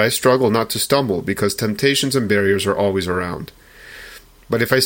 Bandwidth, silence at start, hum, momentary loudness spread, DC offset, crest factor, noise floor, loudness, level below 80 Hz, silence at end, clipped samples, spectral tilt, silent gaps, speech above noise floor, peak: 17 kHz; 0 s; none; 21 LU; under 0.1%; 16 dB; -41 dBFS; -18 LUFS; -48 dBFS; 0 s; under 0.1%; -4 dB/octave; none; 23 dB; -2 dBFS